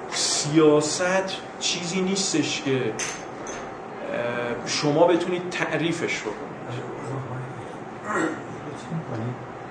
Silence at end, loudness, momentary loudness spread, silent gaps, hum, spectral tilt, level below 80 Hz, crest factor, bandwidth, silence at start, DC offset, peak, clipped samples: 0 s; -25 LUFS; 15 LU; none; none; -4 dB/octave; -62 dBFS; 20 dB; 10.5 kHz; 0 s; under 0.1%; -6 dBFS; under 0.1%